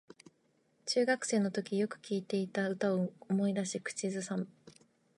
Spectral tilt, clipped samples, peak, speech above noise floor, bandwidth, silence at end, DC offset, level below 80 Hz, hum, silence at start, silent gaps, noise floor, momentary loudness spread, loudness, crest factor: -5 dB/octave; under 0.1%; -18 dBFS; 39 dB; 11.5 kHz; 0.45 s; under 0.1%; -84 dBFS; none; 0.85 s; none; -73 dBFS; 8 LU; -34 LUFS; 18 dB